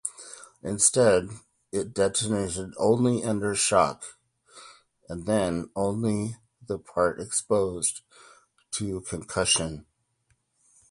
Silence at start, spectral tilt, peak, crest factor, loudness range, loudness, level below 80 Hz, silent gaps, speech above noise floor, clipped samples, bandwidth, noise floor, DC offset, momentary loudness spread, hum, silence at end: 0.05 s; -3.5 dB/octave; -6 dBFS; 22 dB; 5 LU; -26 LUFS; -54 dBFS; none; 45 dB; under 0.1%; 11.5 kHz; -71 dBFS; under 0.1%; 19 LU; none; 1.1 s